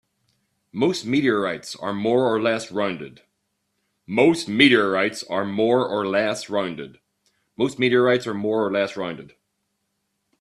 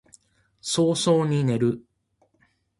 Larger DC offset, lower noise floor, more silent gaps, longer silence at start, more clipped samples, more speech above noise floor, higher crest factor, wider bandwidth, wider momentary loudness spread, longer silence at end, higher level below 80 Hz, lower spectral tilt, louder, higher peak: neither; first, -75 dBFS vs -68 dBFS; neither; about the same, 0.75 s vs 0.65 s; neither; first, 54 dB vs 46 dB; about the same, 22 dB vs 18 dB; about the same, 12.5 kHz vs 11.5 kHz; about the same, 13 LU vs 12 LU; first, 1.15 s vs 1 s; about the same, -64 dBFS vs -62 dBFS; about the same, -5 dB/octave vs -5.5 dB/octave; about the same, -21 LUFS vs -23 LUFS; first, 0 dBFS vs -8 dBFS